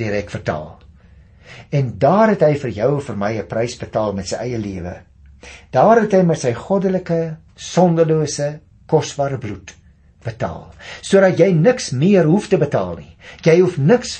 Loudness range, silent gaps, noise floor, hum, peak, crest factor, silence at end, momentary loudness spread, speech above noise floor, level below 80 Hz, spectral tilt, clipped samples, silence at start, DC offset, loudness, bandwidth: 4 LU; none; -46 dBFS; none; -2 dBFS; 16 dB; 0 s; 17 LU; 29 dB; -48 dBFS; -6.5 dB/octave; under 0.1%; 0 s; under 0.1%; -17 LUFS; 8.8 kHz